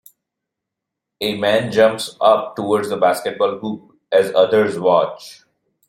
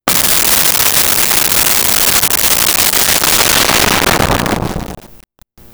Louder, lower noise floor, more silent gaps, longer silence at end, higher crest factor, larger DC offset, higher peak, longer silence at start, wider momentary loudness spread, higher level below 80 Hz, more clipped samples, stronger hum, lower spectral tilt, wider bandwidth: second, -17 LUFS vs -8 LUFS; first, -82 dBFS vs -42 dBFS; neither; about the same, 0.55 s vs 0.55 s; about the same, 16 dB vs 12 dB; neither; about the same, -2 dBFS vs 0 dBFS; first, 1.2 s vs 0.05 s; first, 10 LU vs 7 LU; second, -62 dBFS vs -32 dBFS; neither; neither; first, -4.5 dB/octave vs -1.5 dB/octave; second, 16.5 kHz vs over 20 kHz